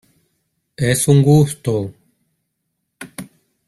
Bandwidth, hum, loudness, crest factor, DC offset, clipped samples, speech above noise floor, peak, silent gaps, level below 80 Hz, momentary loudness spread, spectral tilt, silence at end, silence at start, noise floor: 13.5 kHz; none; -15 LUFS; 18 dB; under 0.1%; under 0.1%; 60 dB; -2 dBFS; none; -50 dBFS; 23 LU; -6 dB/octave; 0.45 s; 0.8 s; -74 dBFS